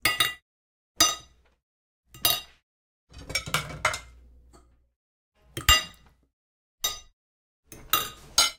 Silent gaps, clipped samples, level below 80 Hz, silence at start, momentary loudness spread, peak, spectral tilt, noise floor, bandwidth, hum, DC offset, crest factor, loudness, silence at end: 0.42-0.95 s, 1.63-2.03 s, 2.63-3.07 s, 4.96-5.32 s, 6.33-6.78 s, 7.13-7.63 s; under 0.1%; -46 dBFS; 0.05 s; 16 LU; -4 dBFS; -0.5 dB/octave; -58 dBFS; 18 kHz; none; under 0.1%; 26 dB; -25 LUFS; 0.05 s